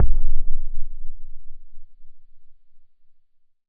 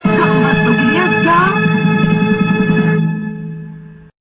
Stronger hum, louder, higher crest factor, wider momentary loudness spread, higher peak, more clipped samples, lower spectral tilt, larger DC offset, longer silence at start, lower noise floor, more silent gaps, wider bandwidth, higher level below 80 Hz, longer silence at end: neither; second, -32 LUFS vs -12 LUFS; about the same, 12 dB vs 12 dB; first, 23 LU vs 14 LU; about the same, -4 dBFS vs -2 dBFS; neither; about the same, -12.5 dB/octave vs -11.5 dB/octave; neither; about the same, 0 s vs 0.05 s; first, -54 dBFS vs -33 dBFS; neither; second, 0.3 kHz vs 4 kHz; first, -24 dBFS vs -44 dBFS; first, 0.9 s vs 0.25 s